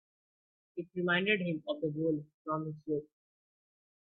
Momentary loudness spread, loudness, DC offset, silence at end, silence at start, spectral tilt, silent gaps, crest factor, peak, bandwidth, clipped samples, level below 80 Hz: 11 LU; -34 LUFS; under 0.1%; 1 s; 0.75 s; -9 dB/octave; 2.34-2.45 s; 22 dB; -16 dBFS; 4.3 kHz; under 0.1%; -76 dBFS